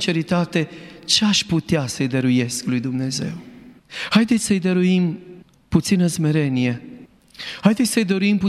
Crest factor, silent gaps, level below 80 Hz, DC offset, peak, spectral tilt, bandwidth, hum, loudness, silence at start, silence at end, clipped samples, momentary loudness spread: 18 dB; none; -52 dBFS; under 0.1%; -2 dBFS; -5 dB/octave; 14 kHz; none; -20 LUFS; 0 s; 0 s; under 0.1%; 13 LU